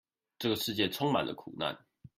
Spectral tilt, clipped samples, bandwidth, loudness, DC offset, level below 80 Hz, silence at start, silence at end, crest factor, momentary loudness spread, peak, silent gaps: -4.5 dB/octave; under 0.1%; 16 kHz; -33 LUFS; under 0.1%; -70 dBFS; 0.4 s; 0.1 s; 20 dB; 8 LU; -16 dBFS; none